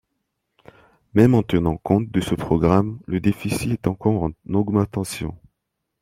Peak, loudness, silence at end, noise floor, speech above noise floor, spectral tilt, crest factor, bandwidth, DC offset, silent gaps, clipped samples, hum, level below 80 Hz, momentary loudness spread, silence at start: -2 dBFS; -21 LUFS; 0.65 s; -78 dBFS; 58 dB; -7.5 dB/octave; 20 dB; 16 kHz; under 0.1%; none; under 0.1%; none; -44 dBFS; 9 LU; 1.15 s